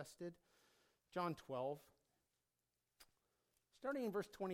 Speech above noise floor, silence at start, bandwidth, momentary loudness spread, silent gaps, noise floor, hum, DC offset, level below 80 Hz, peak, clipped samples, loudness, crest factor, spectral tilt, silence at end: over 44 dB; 0 s; 17 kHz; 10 LU; none; under -90 dBFS; none; under 0.1%; -84 dBFS; -32 dBFS; under 0.1%; -47 LUFS; 18 dB; -6 dB/octave; 0 s